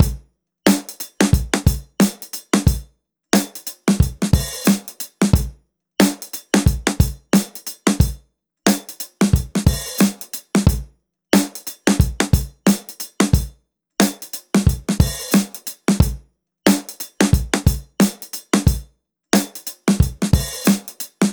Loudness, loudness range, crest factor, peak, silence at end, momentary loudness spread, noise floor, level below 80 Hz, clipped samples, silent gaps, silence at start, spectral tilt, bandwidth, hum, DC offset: -19 LUFS; 1 LU; 18 dB; 0 dBFS; 0 s; 11 LU; -53 dBFS; -28 dBFS; under 0.1%; none; 0 s; -5 dB/octave; over 20 kHz; none; under 0.1%